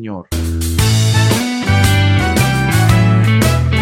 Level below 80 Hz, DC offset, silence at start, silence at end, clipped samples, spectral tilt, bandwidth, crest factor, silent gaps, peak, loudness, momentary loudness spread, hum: -26 dBFS; under 0.1%; 0 s; 0 s; under 0.1%; -5 dB/octave; 16.5 kHz; 12 dB; none; 0 dBFS; -13 LUFS; 7 LU; none